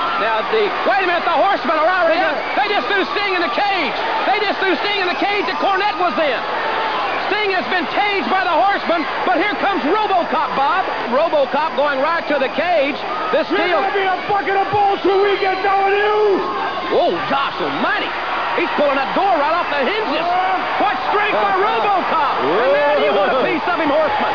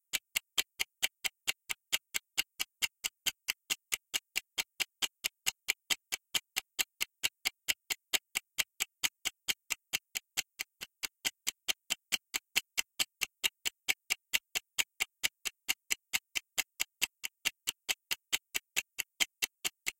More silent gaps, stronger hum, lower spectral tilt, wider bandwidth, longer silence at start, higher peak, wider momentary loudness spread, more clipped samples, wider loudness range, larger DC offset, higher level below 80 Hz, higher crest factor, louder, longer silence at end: neither; neither; first, -5 dB/octave vs 2.5 dB/octave; second, 5.4 kHz vs 17 kHz; second, 0 s vs 0.15 s; first, -4 dBFS vs -10 dBFS; about the same, 3 LU vs 4 LU; neither; about the same, 1 LU vs 2 LU; first, 1% vs under 0.1%; first, -54 dBFS vs -74 dBFS; second, 12 dB vs 28 dB; first, -17 LUFS vs -35 LUFS; about the same, 0 s vs 0.1 s